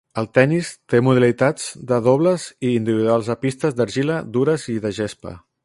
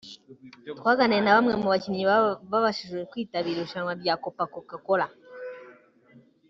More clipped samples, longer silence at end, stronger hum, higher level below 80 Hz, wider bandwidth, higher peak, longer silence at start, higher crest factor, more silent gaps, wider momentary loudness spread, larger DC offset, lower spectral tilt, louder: neither; second, 0.25 s vs 0.75 s; neither; first, -56 dBFS vs -68 dBFS; first, 11.5 kHz vs 7.6 kHz; first, 0 dBFS vs -6 dBFS; about the same, 0.15 s vs 0.05 s; about the same, 18 dB vs 20 dB; neither; second, 9 LU vs 20 LU; neither; first, -6.5 dB/octave vs -3 dB/octave; first, -19 LUFS vs -25 LUFS